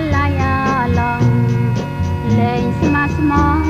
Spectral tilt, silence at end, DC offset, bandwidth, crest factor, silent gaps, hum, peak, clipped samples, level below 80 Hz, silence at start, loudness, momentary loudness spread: -7.5 dB/octave; 0 s; under 0.1%; 8 kHz; 12 dB; none; none; -2 dBFS; under 0.1%; -28 dBFS; 0 s; -16 LUFS; 4 LU